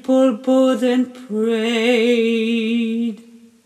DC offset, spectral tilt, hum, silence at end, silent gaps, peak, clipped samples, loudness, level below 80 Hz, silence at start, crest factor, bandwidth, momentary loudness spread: under 0.1%; -5 dB/octave; none; 0.45 s; none; -6 dBFS; under 0.1%; -18 LUFS; -78 dBFS; 0.05 s; 12 dB; 12.5 kHz; 8 LU